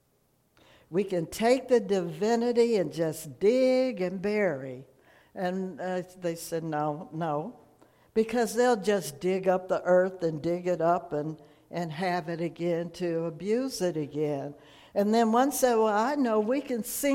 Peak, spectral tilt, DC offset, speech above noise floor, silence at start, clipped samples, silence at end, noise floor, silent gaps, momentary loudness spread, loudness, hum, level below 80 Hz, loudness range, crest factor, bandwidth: -12 dBFS; -5.5 dB/octave; under 0.1%; 42 dB; 0.9 s; under 0.1%; 0 s; -69 dBFS; none; 10 LU; -28 LUFS; none; -66 dBFS; 6 LU; 16 dB; 16.5 kHz